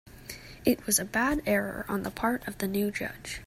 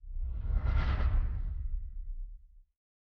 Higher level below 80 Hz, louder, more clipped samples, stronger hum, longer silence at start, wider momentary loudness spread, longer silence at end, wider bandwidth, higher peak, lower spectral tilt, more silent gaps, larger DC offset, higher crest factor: second, -50 dBFS vs -34 dBFS; first, -29 LUFS vs -36 LUFS; neither; neither; about the same, 0.05 s vs 0.05 s; second, 10 LU vs 15 LU; second, 0 s vs 0.5 s; first, 16 kHz vs 5.2 kHz; first, -10 dBFS vs -18 dBFS; second, -3.5 dB/octave vs -8.5 dB/octave; neither; neither; first, 20 dB vs 14 dB